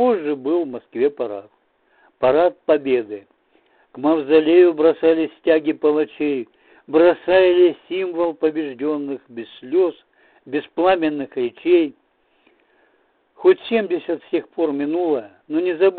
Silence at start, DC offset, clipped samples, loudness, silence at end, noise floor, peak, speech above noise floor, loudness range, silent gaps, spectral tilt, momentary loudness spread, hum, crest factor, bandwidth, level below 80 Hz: 0 s; under 0.1%; under 0.1%; -19 LUFS; 0 s; -62 dBFS; -4 dBFS; 44 dB; 5 LU; none; -9.5 dB/octave; 13 LU; none; 16 dB; 4.4 kHz; -62 dBFS